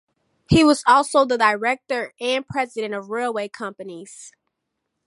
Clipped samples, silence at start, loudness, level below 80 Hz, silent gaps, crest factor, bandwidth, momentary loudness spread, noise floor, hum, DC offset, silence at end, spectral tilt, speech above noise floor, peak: under 0.1%; 0.5 s; -20 LUFS; -48 dBFS; none; 18 dB; 11.5 kHz; 20 LU; -78 dBFS; none; under 0.1%; 0.8 s; -5 dB/octave; 58 dB; -4 dBFS